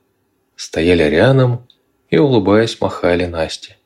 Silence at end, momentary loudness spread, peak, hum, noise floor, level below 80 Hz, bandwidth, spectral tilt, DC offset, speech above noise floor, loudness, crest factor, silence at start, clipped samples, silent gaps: 0.2 s; 12 LU; -2 dBFS; none; -64 dBFS; -44 dBFS; 11.5 kHz; -6.5 dB/octave; under 0.1%; 50 dB; -14 LUFS; 14 dB; 0.6 s; under 0.1%; none